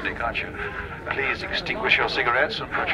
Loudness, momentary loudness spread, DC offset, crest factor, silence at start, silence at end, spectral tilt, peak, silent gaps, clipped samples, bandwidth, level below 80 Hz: -24 LUFS; 11 LU; under 0.1%; 20 dB; 0 s; 0 s; -4.5 dB/octave; -4 dBFS; none; under 0.1%; 14.5 kHz; -44 dBFS